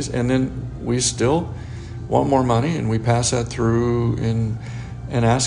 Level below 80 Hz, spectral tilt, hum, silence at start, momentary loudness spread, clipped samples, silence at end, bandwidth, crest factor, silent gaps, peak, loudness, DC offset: -38 dBFS; -5.5 dB/octave; none; 0 s; 13 LU; under 0.1%; 0 s; 10.5 kHz; 18 dB; none; -2 dBFS; -20 LUFS; under 0.1%